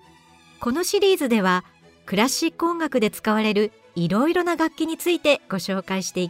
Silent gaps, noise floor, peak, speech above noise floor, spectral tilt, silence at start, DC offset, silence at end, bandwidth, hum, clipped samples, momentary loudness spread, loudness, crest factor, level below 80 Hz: none; -52 dBFS; -6 dBFS; 30 dB; -4.5 dB/octave; 0.6 s; under 0.1%; 0 s; 16 kHz; none; under 0.1%; 7 LU; -22 LUFS; 16 dB; -60 dBFS